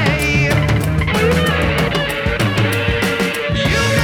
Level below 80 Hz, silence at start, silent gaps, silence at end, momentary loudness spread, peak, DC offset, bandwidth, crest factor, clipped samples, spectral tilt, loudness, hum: -28 dBFS; 0 s; none; 0 s; 3 LU; -2 dBFS; under 0.1%; 19.5 kHz; 14 dB; under 0.1%; -5 dB/octave; -16 LUFS; none